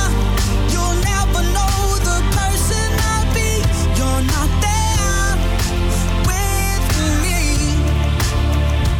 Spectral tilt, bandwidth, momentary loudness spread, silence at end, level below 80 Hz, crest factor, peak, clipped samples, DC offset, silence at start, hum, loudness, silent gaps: -4.5 dB/octave; 17.5 kHz; 1 LU; 0 s; -18 dBFS; 8 dB; -8 dBFS; under 0.1%; under 0.1%; 0 s; none; -17 LUFS; none